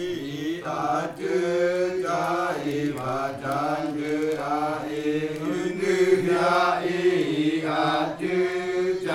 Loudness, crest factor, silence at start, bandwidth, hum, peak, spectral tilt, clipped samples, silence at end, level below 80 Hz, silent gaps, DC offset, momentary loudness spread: -25 LUFS; 16 dB; 0 s; 14.5 kHz; none; -8 dBFS; -5.5 dB/octave; under 0.1%; 0 s; -62 dBFS; none; under 0.1%; 7 LU